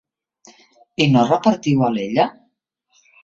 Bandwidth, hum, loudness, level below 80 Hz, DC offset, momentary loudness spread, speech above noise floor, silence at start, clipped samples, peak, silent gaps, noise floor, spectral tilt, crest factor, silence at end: 7.8 kHz; none; -17 LUFS; -58 dBFS; under 0.1%; 6 LU; 52 dB; 1 s; under 0.1%; -2 dBFS; none; -68 dBFS; -6.5 dB/octave; 18 dB; 0.9 s